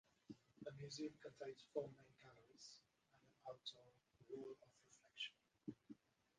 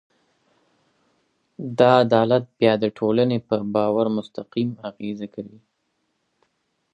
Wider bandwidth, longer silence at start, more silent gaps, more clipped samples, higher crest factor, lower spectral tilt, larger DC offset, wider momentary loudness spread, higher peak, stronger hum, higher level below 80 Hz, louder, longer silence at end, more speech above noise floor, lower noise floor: about the same, 9.6 kHz vs 9.8 kHz; second, 0.3 s vs 1.6 s; neither; neither; about the same, 24 dB vs 22 dB; second, -4.5 dB/octave vs -8 dB/octave; neither; about the same, 16 LU vs 16 LU; second, -32 dBFS vs -2 dBFS; neither; second, -90 dBFS vs -66 dBFS; second, -56 LUFS vs -21 LUFS; second, 0.45 s vs 1.45 s; second, 24 dB vs 52 dB; first, -79 dBFS vs -73 dBFS